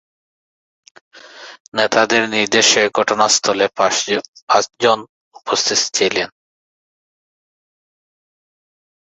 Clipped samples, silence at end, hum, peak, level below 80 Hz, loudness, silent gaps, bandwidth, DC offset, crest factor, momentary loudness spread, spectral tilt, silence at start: under 0.1%; 2.9 s; none; 0 dBFS; -62 dBFS; -15 LUFS; 1.60-1.72 s, 4.28-4.33 s, 4.42-4.47 s, 5.09-5.31 s; 8.4 kHz; under 0.1%; 20 dB; 10 LU; -1 dB/octave; 1.15 s